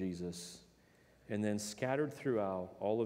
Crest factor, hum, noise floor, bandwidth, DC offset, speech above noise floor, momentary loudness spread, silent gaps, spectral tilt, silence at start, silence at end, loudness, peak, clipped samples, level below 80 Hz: 18 dB; none; -67 dBFS; 16 kHz; under 0.1%; 29 dB; 11 LU; none; -5.5 dB/octave; 0 s; 0 s; -39 LUFS; -20 dBFS; under 0.1%; -72 dBFS